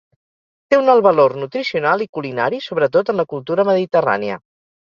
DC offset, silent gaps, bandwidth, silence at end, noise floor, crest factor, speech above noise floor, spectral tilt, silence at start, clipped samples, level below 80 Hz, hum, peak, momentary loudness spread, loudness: under 0.1%; 2.09-2.13 s; 7.2 kHz; 0.5 s; under -90 dBFS; 16 dB; over 74 dB; -6.5 dB/octave; 0.7 s; under 0.1%; -64 dBFS; none; -2 dBFS; 9 LU; -17 LUFS